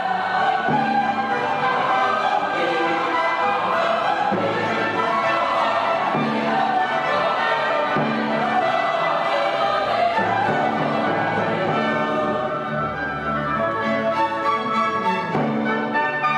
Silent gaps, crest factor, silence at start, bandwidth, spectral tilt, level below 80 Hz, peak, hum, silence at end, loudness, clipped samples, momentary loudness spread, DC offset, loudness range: none; 12 dB; 0 s; 11.5 kHz; -5.5 dB/octave; -56 dBFS; -8 dBFS; none; 0 s; -21 LUFS; under 0.1%; 2 LU; under 0.1%; 2 LU